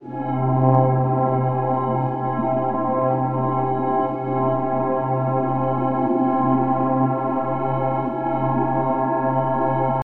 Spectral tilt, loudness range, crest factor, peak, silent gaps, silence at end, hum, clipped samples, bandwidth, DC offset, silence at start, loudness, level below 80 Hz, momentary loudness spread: -12 dB/octave; 1 LU; 16 dB; -4 dBFS; none; 0 s; none; under 0.1%; 3.2 kHz; under 0.1%; 0 s; -21 LUFS; -54 dBFS; 4 LU